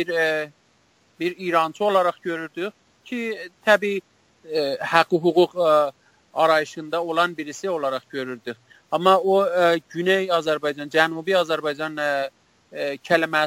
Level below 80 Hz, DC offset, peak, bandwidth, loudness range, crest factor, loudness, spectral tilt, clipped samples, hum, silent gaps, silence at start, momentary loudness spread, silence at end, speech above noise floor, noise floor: -70 dBFS; under 0.1%; 0 dBFS; 16.5 kHz; 4 LU; 22 dB; -22 LUFS; -4.5 dB/octave; under 0.1%; none; none; 0 s; 12 LU; 0 s; 40 dB; -61 dBFS